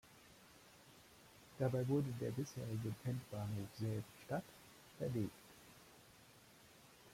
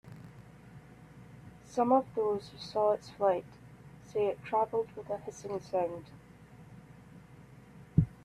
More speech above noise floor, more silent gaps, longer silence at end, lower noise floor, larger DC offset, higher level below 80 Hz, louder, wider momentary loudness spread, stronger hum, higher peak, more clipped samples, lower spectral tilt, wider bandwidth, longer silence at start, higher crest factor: about the same, 23 dB vs 22 dB; neither; about the same, 0 s vs 0.1 s; first, -65 dBFS vs -54 dBFS; neither; second, -74 dBFS vs -56 dBFS; second, -44 LUFS vs -33 LUFS; about the same, 23 LU vs 24 LU; neither; second, -26 dBFS vs -12 dBFS; neither; about the same, -7 dB/octave vs -7.5 dB/octave; first, 16.5 kHz vs 13 kHz; about the same, 0.05 s vs 0.05 s; about the same, 20 dB vs 22 dB